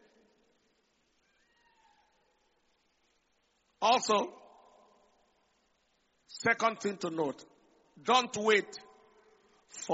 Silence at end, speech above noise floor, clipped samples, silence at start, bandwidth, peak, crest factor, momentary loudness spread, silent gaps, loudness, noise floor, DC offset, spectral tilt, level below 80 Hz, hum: 0 s; 45 dB; under 0.1%; 3.8 s; 8 kHz; -12 dBFS; 24 dB; 21 LU; none; -30 LUFS; -75 dBFS; under 0.1%; -1 dB/octave; -80 dBFS; none